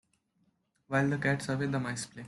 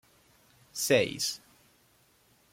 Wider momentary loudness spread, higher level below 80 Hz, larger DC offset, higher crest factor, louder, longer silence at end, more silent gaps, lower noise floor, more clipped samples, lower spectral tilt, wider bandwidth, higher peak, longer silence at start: second, 5 LU vs 17 LU; about the same, -66 dBFS vs -70 dBFS; neither; about the same, 18 dB vs 22 dB; second, -31 LUFS vs -28 LUFS; second, 0 s vs 1.15 s; neither; first, -74 dBFS vs -66 dBFS; neither; first, -5.5 dB/octave vs -2.5 dB/octave; second, 12 kHz vs 16.5 kHz; second, -16 dBFS vs -12 dBFS; first, 0.9 s vs 0.75 s